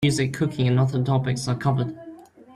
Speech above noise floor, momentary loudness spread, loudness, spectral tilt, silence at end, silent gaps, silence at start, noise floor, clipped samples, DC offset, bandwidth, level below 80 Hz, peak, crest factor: 22 dB; 10 LU; -23 LUFS; -6.5 dB/octave; 0.3 s; none; 0 s; -44 dBFS; under 0.1%; under 0.1%; 12.5 kHz; -52 dBFS; -8 dBFS; 14 dB